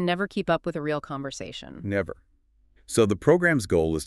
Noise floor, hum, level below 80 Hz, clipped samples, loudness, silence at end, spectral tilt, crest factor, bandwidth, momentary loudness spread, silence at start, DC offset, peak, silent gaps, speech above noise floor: -62 dBFS; none; -48 dBFS; under 0.1%; -25 LUFS; 0 s; -5.5 dB/octave; 20 dB; 13.5 kHz; 16 LU; 0 s; under 0.1%; -6 dBFS; none; 37 dB